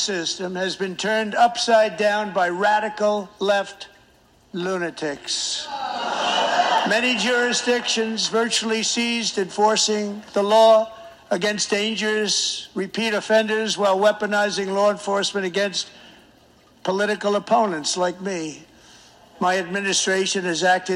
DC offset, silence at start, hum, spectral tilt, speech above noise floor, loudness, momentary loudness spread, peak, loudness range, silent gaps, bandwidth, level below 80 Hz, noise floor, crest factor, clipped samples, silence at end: under 0.1%; 0 s; none; -2.5 dB/octave; 34 dB; -21 LUFS; 9 LU; -4 dBFS; 5 LU; none; 15 kHz; -66 dBFS; -55 dBFS; 16 dB; under 0.1%; 0 s